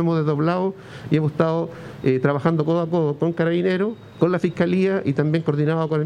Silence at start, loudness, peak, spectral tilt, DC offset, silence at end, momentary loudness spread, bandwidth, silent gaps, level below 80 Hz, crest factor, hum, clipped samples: 0 s; -21 LUFS; -4 dBFS; -9 dB/octave; under 0.1%; 0 s; 5 LU; 8.8 kHz; none; -60 dBFS; 16 dB; none; under 0.1%